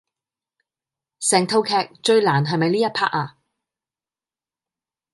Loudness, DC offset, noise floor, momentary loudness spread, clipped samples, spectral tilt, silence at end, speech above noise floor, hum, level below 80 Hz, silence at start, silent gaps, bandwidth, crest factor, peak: -19 LUFS; under 0.1%; under -90 dBFS; 6 LU; under 0.1%; -4 dB/octave; 1.85 s; over 71 dB; none; -72 dBFS; 1.2 s; none; 11.5 kHz; 22 dB; -2 dBFS